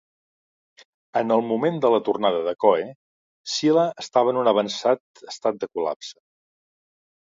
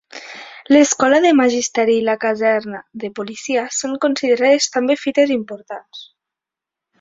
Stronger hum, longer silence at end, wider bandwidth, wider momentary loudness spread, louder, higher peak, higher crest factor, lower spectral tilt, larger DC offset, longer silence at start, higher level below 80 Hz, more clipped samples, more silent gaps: neither; first, 1.1 s vs 0.95 s; about the same, 7.8 kHz vs 7.8 kHz; second, 9 LU vs 19 LU; second, -22 LUFS vs -16 LUFS; about the same, -4 dBFS vs -2 dBFS; about the same, 20 dB vs 16 dB; first, -5 dB/octave vs -2.5 dB/octave; neither; first, 1.15 s vs 0.15 s; second, -74 dBFS vs -64 dBFS; neither; first, 2.95-3.44 s, 5.00-5.14 s, 5.96-6.00 s vs none